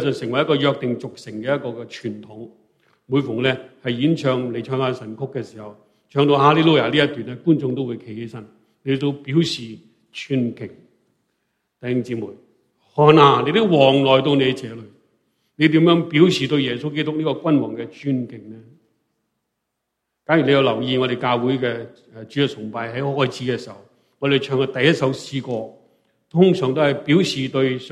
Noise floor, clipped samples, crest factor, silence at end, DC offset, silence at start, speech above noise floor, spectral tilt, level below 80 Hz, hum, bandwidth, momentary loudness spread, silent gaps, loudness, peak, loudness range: -78 dBFS; under 0.1%; 20 dB; 0 s; under 0.1%; 0 s; 59 dB; -6.5 dB/octave; -62 dBFS; none; 11.5 kHz; 18 LU; none; -19 LUFS; 0 dBFS; 9 LU